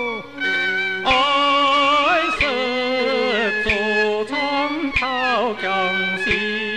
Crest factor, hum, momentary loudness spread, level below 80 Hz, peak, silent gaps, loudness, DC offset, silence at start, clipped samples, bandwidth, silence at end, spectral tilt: 14 dB; none; 6 LU; -42 dBFS; -6 dBFS; none; -18 LUFS; 0.4%; 0 s; under 0.1%; 13 kHz; 0 s; -3.5 dB/octave